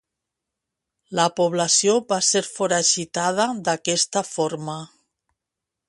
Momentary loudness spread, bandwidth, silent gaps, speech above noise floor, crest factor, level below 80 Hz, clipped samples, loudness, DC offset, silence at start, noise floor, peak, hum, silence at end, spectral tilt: 9 LU; 11.5 kHz; none; 63 dB; 18 dB; -68 dBFS; under 0.1%; -21 LUFS; under 0.1%; 1.1 s; -85 dBFS; -6 dBFS; none; 1.05 s; -2.5 dB/octave